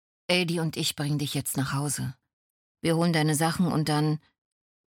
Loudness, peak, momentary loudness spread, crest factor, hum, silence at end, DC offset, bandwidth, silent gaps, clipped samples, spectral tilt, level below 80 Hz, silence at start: -27 LUFS; -10 dBFS; 7 LU; 18 dB; none; 0.75 s; under 0.1%; 17.5 kHz; 2.33-2.75 s; under 0.1%; -4.5 dB/octave; -62 dBFS; 0.3 s